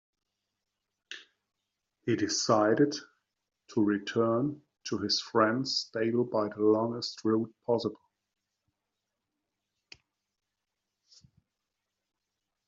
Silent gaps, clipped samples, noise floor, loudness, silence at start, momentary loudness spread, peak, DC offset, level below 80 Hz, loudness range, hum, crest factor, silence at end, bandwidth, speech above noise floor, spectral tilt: none; under 0.1%; -86 dBFS; -29 LUFS; 1.1 s; 13 LU; -10 dBFS; under 0.1%; -76 dBFS; 7 LU; none; 22 dB; 4.75 s; 7.8 kHz; 58 dB; -4 dB/octave